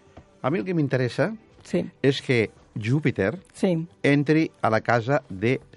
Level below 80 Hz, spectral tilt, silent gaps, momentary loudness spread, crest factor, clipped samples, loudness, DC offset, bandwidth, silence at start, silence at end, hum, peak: -62 dBFS; -7 dB/octave; none; 7 LU; 20 dB; under 0.1%; -24 LUFS; under 0.1%; 11.5 kHz; 0.15 s; 0.2 s; none; -4 dBFS